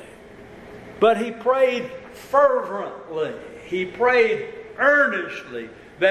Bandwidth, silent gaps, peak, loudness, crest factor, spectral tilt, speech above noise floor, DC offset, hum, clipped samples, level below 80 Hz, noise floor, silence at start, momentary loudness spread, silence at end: 13.5 kHz; none; -4 dBFS; -21 LUFS; 18 dB; -5 dB/octave; 22 dB; under 0.1%; none; under 0.1%; -58 dBFS; -43 dBFS; 0 s; 19 LU; 0 s